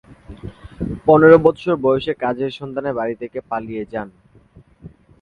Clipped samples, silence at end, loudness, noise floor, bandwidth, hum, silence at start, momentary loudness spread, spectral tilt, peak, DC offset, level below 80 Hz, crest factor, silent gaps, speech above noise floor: under 0.1%; 0.35 s; -17 LUFS; -49 dBFS; 4.9 kHz; none; 0.3 s; 26 LU; -8.5 dB/octave; 0 dBFS; under 0.1%; -46 dBFS; 18 dB; none; 32 dB